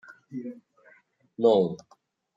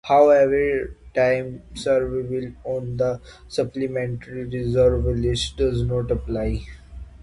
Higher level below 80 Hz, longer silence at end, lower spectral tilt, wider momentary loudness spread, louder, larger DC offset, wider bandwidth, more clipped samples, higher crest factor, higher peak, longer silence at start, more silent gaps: second, -78 dBFS vs -34 dBFS; first, 0.6 s vs 0 s; about the same, -7.5 dB/octave vs -6.5 dB/octave; first, 21 LU vs 13 LU; about the same, -24 LUFS vs -22 LUFS; neither; second, 7.6 kHz vs 11.5 kHz; neither; about the same, 20 dB vs 18 dB; second, -8 dBFS vs -4 dBFS; about the same, 0.1 s vs 0.05 s; neither